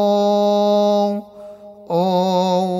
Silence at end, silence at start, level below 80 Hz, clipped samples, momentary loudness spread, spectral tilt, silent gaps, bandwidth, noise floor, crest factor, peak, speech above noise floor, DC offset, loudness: 0 s; 0 s; -68 dBFS; under 0.1%; 12 LU; -7 dB/octave; none; 15.5 kHz; -38 dBFS; 12 dB; -6 dBFS; 22 dB; under 0.1%; -17 LUFS